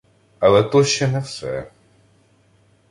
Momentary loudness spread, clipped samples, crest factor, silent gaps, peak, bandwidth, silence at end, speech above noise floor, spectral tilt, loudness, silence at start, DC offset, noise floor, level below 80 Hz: 14 LU; under 0.1%; 18 dB; none; -2 dBFS; 11.5 kHz; 1.25 s; 40 dB; -5 dB/octave; -18 LUFS; 0.4 s; under 0.1%; -57 dBFS; -52 dBFS